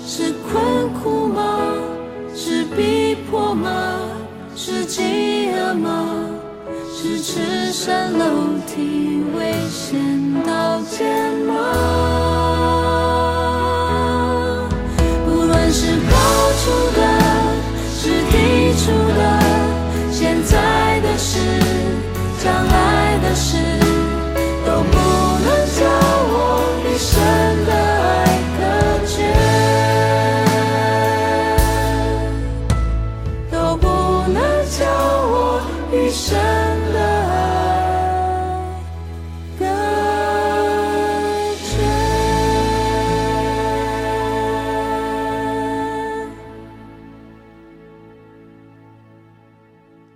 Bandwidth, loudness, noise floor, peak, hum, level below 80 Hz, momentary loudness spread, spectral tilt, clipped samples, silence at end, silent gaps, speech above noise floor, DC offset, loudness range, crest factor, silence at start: 16 kHz; -17 LUFS; -49 dBFS; 0 dBFS; none; -28 dBFS; 8 LU; -5 dB/octave; under 0.1%; 2.05 s; none; 30 dB; under 0.1%; 5 LU; 16 dB; 0 s